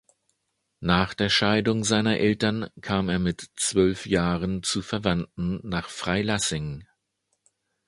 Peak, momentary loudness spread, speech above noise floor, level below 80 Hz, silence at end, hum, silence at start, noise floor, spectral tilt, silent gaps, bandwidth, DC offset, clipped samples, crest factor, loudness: -4 dBFS; 9 LU; 52 dB; -46 dBFS; 1.05 s; none; 0.8 s; -77 dBFS; -4.5 dB/octave; none; 11.5 kHz; under 0.1%; under 0.1%; 22 dB; -25 LUFS